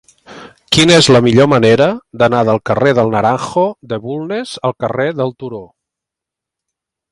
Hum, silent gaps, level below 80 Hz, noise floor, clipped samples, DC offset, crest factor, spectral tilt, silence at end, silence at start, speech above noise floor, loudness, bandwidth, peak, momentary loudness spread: none; none; -46 dBFS; -83 dBFS; under 0.1%; under 0.1%; 14 dB; -5 dB/octave; 1.45 s; 0.3 s; 71 dB; -12 LUFS; 14 kHz; 0 dBFS; 13 LU